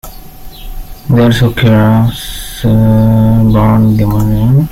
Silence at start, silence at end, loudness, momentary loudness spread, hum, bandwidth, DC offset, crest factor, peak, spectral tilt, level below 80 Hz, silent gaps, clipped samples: 0.05 s; 0 s; -9 LUFS; 14 LU; none; 16 kHz; under 0.1%; 8 dB; 0 dBFS; -7.5 dB/octave; -24 dBFS; none; under 0.1%